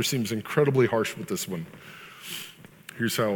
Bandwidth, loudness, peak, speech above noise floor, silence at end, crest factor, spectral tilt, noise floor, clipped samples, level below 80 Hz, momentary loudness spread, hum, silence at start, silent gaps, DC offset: 19 kHz; -27 LUFS; -8 dBFS; 21 dB; 0 s; 18 dB; -4.5 dB/octave; -47 dBFS; under 0.1%; -68 dBFS; 21 LU; none; 0 s; none; under 0.1%